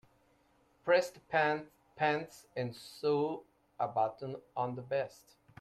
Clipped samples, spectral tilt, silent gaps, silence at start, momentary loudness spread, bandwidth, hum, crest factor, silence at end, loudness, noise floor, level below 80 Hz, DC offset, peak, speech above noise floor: under 0.1%; -5.5 dB/octave; none; 0.85 s; 13 LU; 14 kHz; none; 18 dB; 0.55 s; -35 LUFS; -70 dBFS; -76 dBFS; under 0.1%; -16 dBFS; 36 dB